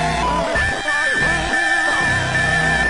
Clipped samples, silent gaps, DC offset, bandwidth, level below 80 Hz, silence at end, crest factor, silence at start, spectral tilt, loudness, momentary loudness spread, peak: under 0.1%; none; under 0.1%; 11.5 kHz; -32 dBFS; 0 s; 12 dB; 0 s; -3.5 dB/octave; -17 LUFS; 3 LU; -6 dBFS